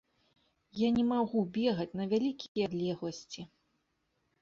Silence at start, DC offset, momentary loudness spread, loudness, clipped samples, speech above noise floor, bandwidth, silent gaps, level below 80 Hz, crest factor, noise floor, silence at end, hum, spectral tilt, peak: 0.75 s; under 0.1%; 17 LU; -33 LUFS; under 0.1%; 47 dB; 7.4 kHz; 2.48-2.55 s; -68 dBFS; 16 dB; -79 dBFS; 0.95 s; none; -6.5 dB/octave; -18 dBFS